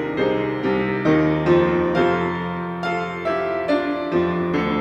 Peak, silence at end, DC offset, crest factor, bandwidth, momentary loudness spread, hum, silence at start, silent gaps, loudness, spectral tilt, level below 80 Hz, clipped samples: -4 dBFS; 0 s; under 0.1%; 16 dB; 7.8 kHz; 7 LU; none; 0 s; none; -21 LUFS; -8 dB/octave; -48 dBFS; under 0.1%